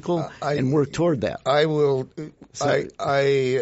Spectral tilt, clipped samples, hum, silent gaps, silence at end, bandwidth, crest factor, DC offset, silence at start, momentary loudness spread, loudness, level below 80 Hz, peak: -5 dB/octave; under 0.1%; none; none; 0 s; 8 kHz; 14 dB; under 0.1%; 0.05 s; 7 LU; -22 LUFS; -56 dBFS; -8 dBFS